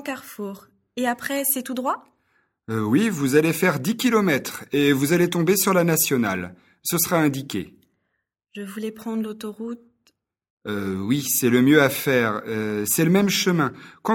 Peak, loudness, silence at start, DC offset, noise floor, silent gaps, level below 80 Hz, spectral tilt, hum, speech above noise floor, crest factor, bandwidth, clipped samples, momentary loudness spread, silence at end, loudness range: -2 dBFS; -21 LUFS; 0 s; under 0.1%; -77 dBFS; 10.50-10.57 s; -62 dBFS; -4.5 dB/octave; none; 55 dB; 20 dB; 17.5 kHz; under 0.1%; 15 LU; 0 s; 10 LU